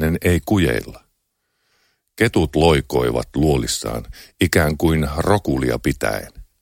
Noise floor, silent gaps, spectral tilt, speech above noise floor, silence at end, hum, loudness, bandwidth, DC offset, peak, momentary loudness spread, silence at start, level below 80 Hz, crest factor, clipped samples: -71 dBFS; none; -5.5 dB/octave; 53 dB; 0.2 s; none; -19 LUFS; 17 kHz; under 0.1%; -2 dBFS; 11 LU; 0 s; -32 dBFS; 18 dB; under 0.1%